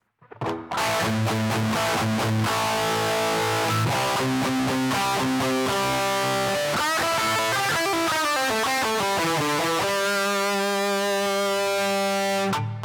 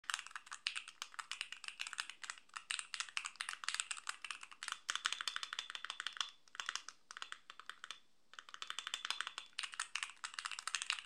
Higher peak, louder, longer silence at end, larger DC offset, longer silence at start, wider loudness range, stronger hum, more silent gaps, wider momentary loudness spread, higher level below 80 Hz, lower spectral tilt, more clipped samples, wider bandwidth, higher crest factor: about the same, -14 dBFS vs -16 dBFS; first, -23 LUFS vs -44 LUFS; about the same, 0 s vs 0 s; neither; first, 0.35 s vs 0.05 s; second, 1 LU vs 4 LU; neither; neither; second, 2 LU vs 11 LU; first, -56 dBFS vs -90 dBFS; first, -3.5 dB/octave vs 4 dB/octave; neither; first, over 20 kHz vs 13 kHz; second, 10 dB vs 32 dB